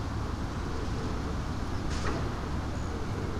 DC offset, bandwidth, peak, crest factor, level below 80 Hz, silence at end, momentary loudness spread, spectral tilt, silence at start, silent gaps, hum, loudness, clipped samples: under 0.1%; 13 kHz; -16 dBFS; 16 dB; -36 dBFS; 0 s; 2 LU; -6 dB/octave; 0 s; none; none; -34 LUFS; under 0.1%